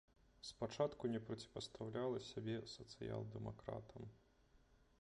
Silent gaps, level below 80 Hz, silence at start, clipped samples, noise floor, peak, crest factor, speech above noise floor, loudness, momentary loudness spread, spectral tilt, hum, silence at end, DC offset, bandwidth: none; -70 dBFS; 0.45 s; under 0.1%; -73 dBFS; -26 dBFS; 22 dB; 26 dB; -48 LUFS; 13 LU; -6 dB/octave; none; 0.25 s; under 0.1%; 11 kHz